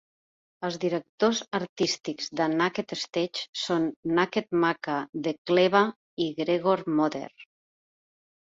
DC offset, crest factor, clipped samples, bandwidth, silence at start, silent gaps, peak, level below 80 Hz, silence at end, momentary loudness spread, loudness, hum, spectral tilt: under 0.1%; 22 dB; under 0.1%; 7.8 kHz; 0.6 s; 1.09-1.18 s, 1.69-1.76 s, 3.49-3.53 s, 3.96-4.03 s, 5.09-5.13 s, 5.38-5.45 s, 5.96-6.17 s; -6 dBFS; -70 dBFS; 1 s; 8 LU; -27 LUFS; none; -4.5 dB/octave